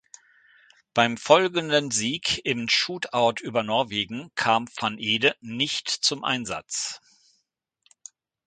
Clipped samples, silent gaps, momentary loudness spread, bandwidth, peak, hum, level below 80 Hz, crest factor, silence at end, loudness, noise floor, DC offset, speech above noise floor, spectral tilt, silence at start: under 0.1%; none; 9 LU; 9.6 kHz; -2 dBFS; none; -64 dBFS; 26 dB; 1.5 s; -24 LUFS; -76 dBFS; under 0.1%; 51 dB; -2.5 dB/octave; 0.95 s